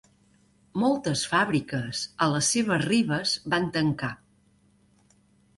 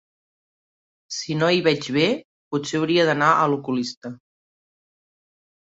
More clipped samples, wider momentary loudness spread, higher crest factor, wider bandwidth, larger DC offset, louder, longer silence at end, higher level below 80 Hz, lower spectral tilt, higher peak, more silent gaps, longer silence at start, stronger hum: neither; second, 9 LU vs 13 LU; about the same, 18 dB vs 22 dB; first, 11.5 kHz vs 8 kHz; neither; second, -26 LUFS vs -21 LUFS; second, 1.45 s vs 1.6 s; first, -60 dBFS vs -66 dBFS; about the same, -4 dB/octave vs -5 dB/octave; second, -8 dBFS vs -2 dBFS; second, none vs 2.25-2.51 s, 3.97-4.02 s; second, 0.75 s vs 1.1 s; neither